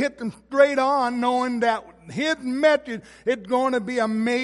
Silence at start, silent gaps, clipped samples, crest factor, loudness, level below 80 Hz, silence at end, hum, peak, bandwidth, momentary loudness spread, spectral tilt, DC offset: 0 s; none; under 0.1%; 20 dB; -22 LUFS; -62 dBFS; 0 s; none; -4 dBFS; 11.5 kHz; 10 LU; -4.5 dB/octave; under 0.1%